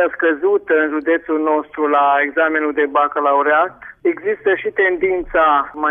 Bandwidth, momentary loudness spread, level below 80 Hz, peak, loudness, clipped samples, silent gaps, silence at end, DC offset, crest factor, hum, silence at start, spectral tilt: 3.7 kHz; 5 LU; -48 dBFS; -4 dBFS; -16 LUFS; under 0.1%; none; 0 s; under 0.1%; 12 dB; none; 0 s; -7.5 dB/octave